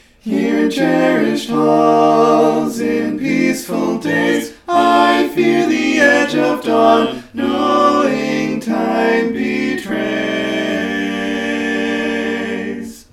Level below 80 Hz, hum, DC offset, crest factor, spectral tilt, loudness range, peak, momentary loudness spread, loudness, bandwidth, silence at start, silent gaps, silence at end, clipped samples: -52 dBFS; none; under 0.1%; 14 dB; -5 dB/octave; 5 LU; 0 dBFS; 8 LU; -15 LUFS; 16 kHz; 0.25 s; none; 0.15 s; under 0.1%